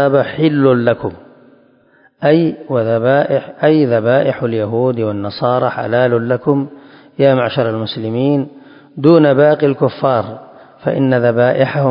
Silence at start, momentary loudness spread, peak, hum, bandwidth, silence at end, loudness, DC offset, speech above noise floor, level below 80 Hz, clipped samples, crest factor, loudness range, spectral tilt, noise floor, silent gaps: 0 s; 9 LU; 0 dBFS; none; 5.4 kHz; 0 s; -14 LUFS; under 0.1%; 38 dB; -54 dBFS; under 0.1%; 14 dB; 2 LU; -11 dB/octave; -51 dBFS; none